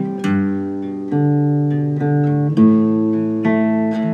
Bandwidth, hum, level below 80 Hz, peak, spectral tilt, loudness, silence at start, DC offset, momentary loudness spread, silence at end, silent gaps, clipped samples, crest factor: 7 kHz; none; -72 dBFS; -2 dBFS; -10 dB/octave; -17 LUFS; 0 s; under 0.1%; 8 LU; 0 s; none; under 0.1%; 14 dB